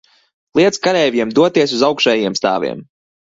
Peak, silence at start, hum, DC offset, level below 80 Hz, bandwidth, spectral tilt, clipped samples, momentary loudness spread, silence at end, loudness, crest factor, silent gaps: 0 dBFS; 0.55 s; none; under 0.1%; -58 dBFS; 8 kHz; -4 dB/octave; under 0.1%; 7 LU; 0.4 s; -15 LUFS; 16 dB; none